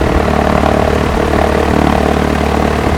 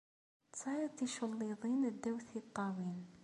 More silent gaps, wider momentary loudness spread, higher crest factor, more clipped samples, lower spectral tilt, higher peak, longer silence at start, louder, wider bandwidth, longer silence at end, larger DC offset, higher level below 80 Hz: neither; second, 2 LU vs 8 LU; about the same, 12 dB vs 14 dB; first, 0.1% vs under 0.1%; about the same, -6.5 dB/octave vs -5.5 dB/octave; first, 0 dBFS vs -26 dBFS; second, 0 s vs 0.55 s; first, -12 LUFS vs -41 LUFS; first, 16.5 kHz vs 11.5 kHz; about the same, 0 s vs 0 s; neither; first, -20 dBFS vs -82 dBFS